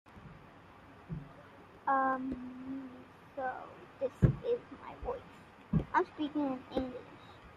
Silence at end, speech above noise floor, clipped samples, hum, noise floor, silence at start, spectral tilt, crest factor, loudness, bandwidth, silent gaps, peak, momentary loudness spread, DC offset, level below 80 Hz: 0 s; 22 dB; under 0.1%; none; -56 dBFS; 0.1 s; -8.5 dB/octave; 26 dB; -36 LUFS; 10 kHz; none; -12 dBFS; 24 LU; under 0.1%; -52 dBFS